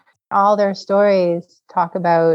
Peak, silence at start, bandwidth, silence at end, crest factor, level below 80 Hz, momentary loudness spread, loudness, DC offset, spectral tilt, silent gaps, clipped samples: -4 dBFS; 0.3 s; 7.6 kHz; 0 s; 14 dB; -86 dBFS; 7 LU; -17 LUFS; under 0.1%; -7 dB/octave; none; under 0.1%